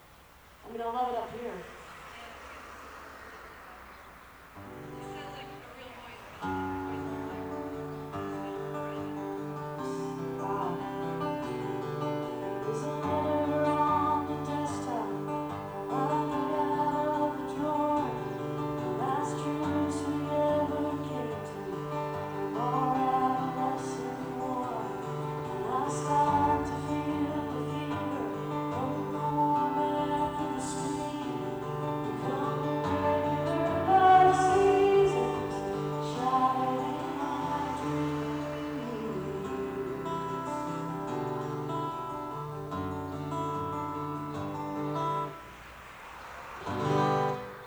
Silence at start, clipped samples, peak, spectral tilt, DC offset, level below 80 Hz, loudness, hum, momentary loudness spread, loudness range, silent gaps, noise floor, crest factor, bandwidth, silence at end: 0 s; under 0.1%; -12 dBFS; -6.5 dB/octave; under 0.1%; -58 dBFS; -31 LUFS; none; 17 LU; 13 LU; none; -55 dBFS; 20 dB; over 20 kHz; 0 s